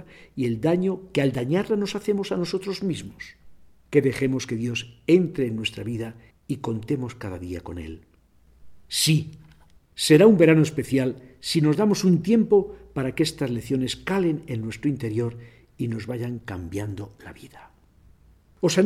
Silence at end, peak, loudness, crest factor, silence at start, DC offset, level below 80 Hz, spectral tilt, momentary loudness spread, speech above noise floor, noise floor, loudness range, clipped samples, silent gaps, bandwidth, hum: 0 s; -4 dBFS; -24 LUFS; 20 dB; 0 s; under 0.1%; -54 dBFS; -5.5 dB/octave; 15 LU; 34 dB; -57 dBFS; 11 LU; under 0.1%; none; 15.5 kHz; none